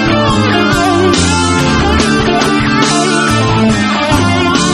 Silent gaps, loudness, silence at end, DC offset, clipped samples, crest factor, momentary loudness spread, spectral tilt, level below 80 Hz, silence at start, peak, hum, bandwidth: none; -10 LUFS; 0 s; under 0.1%; under 0.1%; 10 dB; 1 LU; -4.5 dB/octave; -26 dBFS; 0 s; 0 dBFS; none; 15 kHz